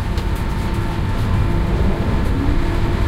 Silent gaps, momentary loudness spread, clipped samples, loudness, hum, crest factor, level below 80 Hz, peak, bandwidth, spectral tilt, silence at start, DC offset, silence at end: none; 3 LU; under 0.1%; -20 LUFS; none; 12 dB; -20 dBFS; -4 dBFS; 15 kHz; -7 dB/octave; 0 s; under 0.1%; 0 s